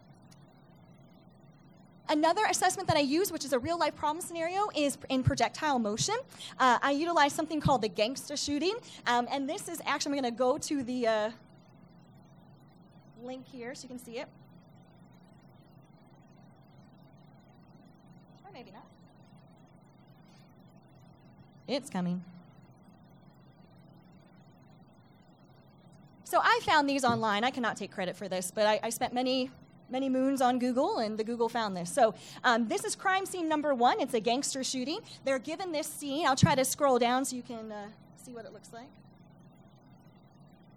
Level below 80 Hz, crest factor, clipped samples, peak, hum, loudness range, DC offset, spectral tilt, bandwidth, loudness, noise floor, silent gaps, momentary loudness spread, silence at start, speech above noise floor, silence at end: -62 dBFS; 24 dB; under 0.1%; -10 dBFS; none; 17 LU; under 0.1%; -4 dB/octave; 16 kHz; -30 LUFS; -59 dBFS; none; 18 LU; 0.3 s; 28 dB; 1.85 s